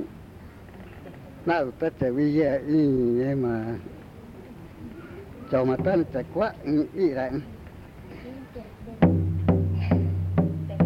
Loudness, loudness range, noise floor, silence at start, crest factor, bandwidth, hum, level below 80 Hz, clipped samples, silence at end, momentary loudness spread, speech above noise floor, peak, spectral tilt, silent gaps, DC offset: -25 LUFS; 3 LU; -44 dBFS; 0 s; 20 dB; 5.8 kHz; none; -50 dBFS; under 0.1%; 0 s; 22 LU; 20 dB; -6 dBFS; -10 dB/octave; none; under 0.1%